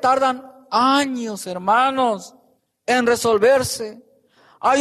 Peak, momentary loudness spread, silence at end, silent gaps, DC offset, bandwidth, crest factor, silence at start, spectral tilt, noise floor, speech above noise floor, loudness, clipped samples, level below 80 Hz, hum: -6 dBFS; 12 LU; 0 s; none; under 0.1%; 13.5 kHz; 14 dB; 0 s; -3.5 dB/octave; -60 dBFS; 42 dB; -19 LUFS; under 0.1%; -62 dBFS; none